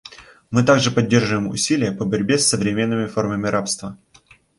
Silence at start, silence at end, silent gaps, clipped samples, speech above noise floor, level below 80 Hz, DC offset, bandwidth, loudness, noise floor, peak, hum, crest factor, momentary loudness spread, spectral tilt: 0.05 s; 0.65 s; none; under 0.1%; 34 dB; -52 dBFS; under 0.1%; 11.5 kHz; -19 LUFS; -52 dBFS; -2 dBFS; none; 18 dB; 7 LU; -4.5 dB/octave